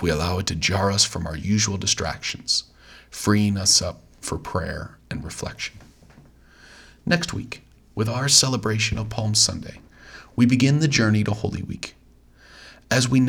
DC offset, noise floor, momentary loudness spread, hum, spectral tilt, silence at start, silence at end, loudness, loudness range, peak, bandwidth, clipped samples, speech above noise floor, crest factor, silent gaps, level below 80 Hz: under 0.1%; -52 dBFS; 17 LU; none; -3.5 dB/octave; 0 s; 0 s; -21 LUFS; 9 LU; -2 dBFS; 18 kHz; under 0.1%; 30 dB; 22 dB; none; -46 dBFS